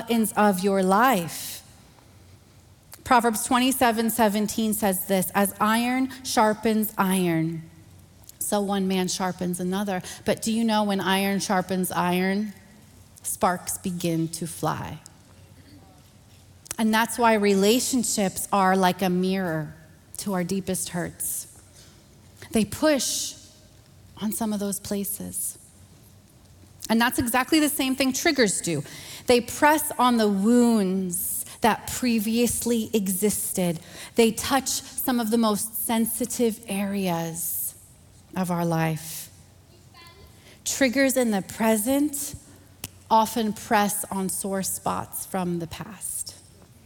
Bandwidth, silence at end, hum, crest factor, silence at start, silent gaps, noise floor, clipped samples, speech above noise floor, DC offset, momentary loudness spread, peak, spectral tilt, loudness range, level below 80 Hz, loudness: 18 kHz; 0.45 s; none; 18 dB; 0 s; none; -53 dBFS; under 0.1%; 29 dB; under 0.1%; 11 LU; -6 dBFS; -4 dB/octave; 7 LU; -56 dBFS; -24 LUFS